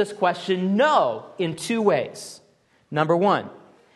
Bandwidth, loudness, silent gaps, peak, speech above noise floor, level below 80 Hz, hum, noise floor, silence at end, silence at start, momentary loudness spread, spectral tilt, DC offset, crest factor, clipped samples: 12.5 kHz; -22 LUFS; none; -6 dBFS; 39 dB; -72 dBFS; none; -60 dBFS; 0.4 s; 0 s; 14 LU; -5.5 dB/octave; under 0.1%; 18 dB; under 0.1%